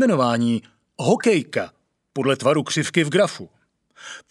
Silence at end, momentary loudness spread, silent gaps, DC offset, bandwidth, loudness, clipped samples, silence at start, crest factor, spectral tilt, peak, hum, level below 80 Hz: 0.1 s; 18 LU; none; under 0.1%; 12.5 kHz; -21 LUFS; under 0.1%; 0 s; 18 dB; -5 dB/octave; -4 dBFS; none; -70 dBFS